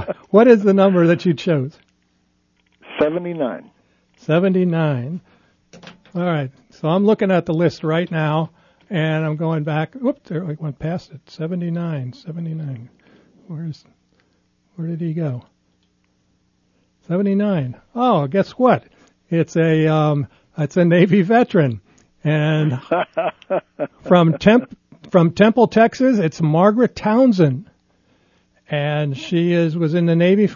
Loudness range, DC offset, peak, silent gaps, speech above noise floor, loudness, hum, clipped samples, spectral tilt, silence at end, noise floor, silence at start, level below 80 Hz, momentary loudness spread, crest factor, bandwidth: 13 LU; under 0.1%; 0 dBFS; none; 46 dB; -18 LUFS; none; under 0.1%; -8 dB/octave; 0 s; -63 dBFS; 0 s; -56 dBFS; 16 LU; 18 dB; 7.2 kHz